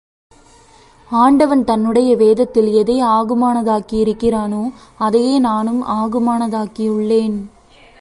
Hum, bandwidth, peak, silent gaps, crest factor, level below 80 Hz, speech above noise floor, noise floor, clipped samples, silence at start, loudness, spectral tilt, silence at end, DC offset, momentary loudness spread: none; 11.5 kHz; 0 dBFS; none; 14 dB; -46 dBFS; 32 dB; -46 dBFS; under 0.1%; 1.1 s; -15 LUFS; -6.5 dB/octave; 0.55 s; under 0.1%; 9 LU